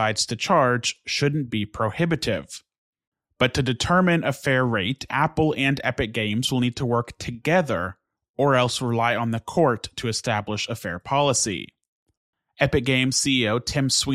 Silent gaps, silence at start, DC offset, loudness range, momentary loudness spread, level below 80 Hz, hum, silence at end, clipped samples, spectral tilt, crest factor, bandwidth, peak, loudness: 2.78-2.93 s, 3.07-3.12 s, 8.29-8.34 s, 11.88-12.06 s, 12.17-12.33 s; 0 s; under 0.1%; 3 LU; 8 LU; -50 dBFS; none; 0 s; under 0.1%; -4 dB/octave; 18 dB; 15 kHz; -4 dBFS; -23 LUFS